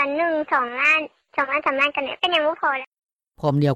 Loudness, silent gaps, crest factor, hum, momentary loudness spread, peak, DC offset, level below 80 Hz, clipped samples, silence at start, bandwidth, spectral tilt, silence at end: -21 LUFS; 2.87-2.92 s; 16 dB; none; 9 LU; -6 dBFS; under 0.1%; -62 dBFS; under 0.1%; 0 s; 9.4 kHz; -6 dB/octave; 0 s